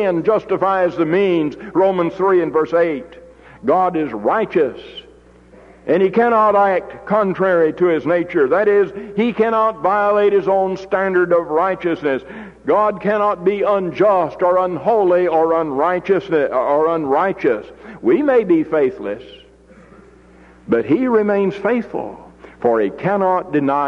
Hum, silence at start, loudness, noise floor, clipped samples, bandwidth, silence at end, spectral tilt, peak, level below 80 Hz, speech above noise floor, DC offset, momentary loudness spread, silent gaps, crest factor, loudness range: none; 0 s; -17 LUFS; -45 dBFS; under 0.1%; 6.8 kHz; 0 s; -8 dB/octave; -4 dBFS; -52 dBFS; 29 dB; under 0.1%; 7 LU; none; 12 dB; 4 LU